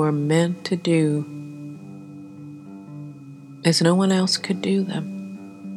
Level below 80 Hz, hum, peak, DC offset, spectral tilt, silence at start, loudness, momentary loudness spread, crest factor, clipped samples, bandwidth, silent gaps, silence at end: -80 dBFS; none; -4 dBFS; under 0.1%; -5.5 dB/octave; 0 s; -21 LUFS; 21 LU; 18 dB; under 0.1%; 13 kHz; none; 0 s